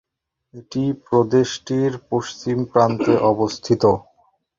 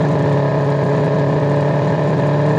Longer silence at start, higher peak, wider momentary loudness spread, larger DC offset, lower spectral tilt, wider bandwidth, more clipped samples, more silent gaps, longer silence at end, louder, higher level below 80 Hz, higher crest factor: first, 0.55 s vs 0 s; first, -2 dBFS vs -6 dBFS; first, 8 LU vs 1 LU; neither; second, -6.5 dB/octave vs -9 dB/octave; about the same, 7.6 kHz vs 7.6 kHz; neither; neither; first, 0.6 s vs 0 s; second, -20 LUFS vs -16 LUFS; about the same, -52 dBFS vs -52 dBFS; first, 18 dB vs 8 dB